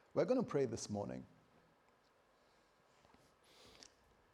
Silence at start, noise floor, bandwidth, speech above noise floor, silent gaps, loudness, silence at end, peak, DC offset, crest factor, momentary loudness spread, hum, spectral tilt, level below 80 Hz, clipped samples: 0.15 s; -73 dBFS; 12.5 kHz; 34 dB; none; -40 LUFS; 0.5 s; -22 dBFS; under 0.1%; 22 dB; 26 LU; none; -6 dB/octave; -78 dBFS; under 0.1%